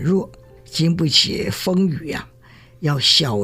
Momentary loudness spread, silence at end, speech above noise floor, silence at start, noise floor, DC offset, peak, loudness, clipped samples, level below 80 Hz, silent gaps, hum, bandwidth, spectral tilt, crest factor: 14 LU; 0 s; 28 dB; 0 s; -47 dBFS; under 0.1%; -2 dBFS; -18 LUFS; under 0.1%; -48 dBFS; none; none; 16 kHz; -4.5 dB/octave; 18 dB